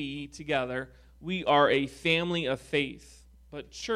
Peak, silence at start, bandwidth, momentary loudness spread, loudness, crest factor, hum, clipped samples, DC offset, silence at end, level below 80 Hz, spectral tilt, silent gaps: -10 dBFS; 0 s; 14 kHz; 21 LU; -28 LUFS; 20 dB; none; under 0.1%; under 0.1%; 0 s; -56 dBFS; -5 dB/octave; none